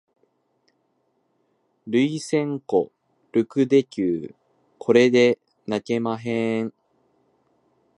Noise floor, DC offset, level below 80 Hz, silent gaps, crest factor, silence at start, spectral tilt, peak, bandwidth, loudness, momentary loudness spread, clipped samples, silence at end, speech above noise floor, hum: -69 dBFS; under 0.1%; -68 dBFS; none; 20 dB; 1.85 s; -6 dB/octave; -4 dBFS; 11 kHz; -22 LUFS; 13 LU; under 0.1%; 1.3 s; 49 dB; none